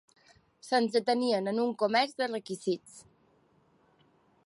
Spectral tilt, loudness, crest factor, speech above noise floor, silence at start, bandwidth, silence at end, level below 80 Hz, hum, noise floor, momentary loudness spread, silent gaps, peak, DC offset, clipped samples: -4.5 dB/octave; -30 LUFS; 20 dB; 37 dB; 0.65 s; 11.5 kHz; 1.45 s; -80 dBFS; none; -67 dBFS; 7 LU; none; -14 dBFS; under 0.1%; under 0.1%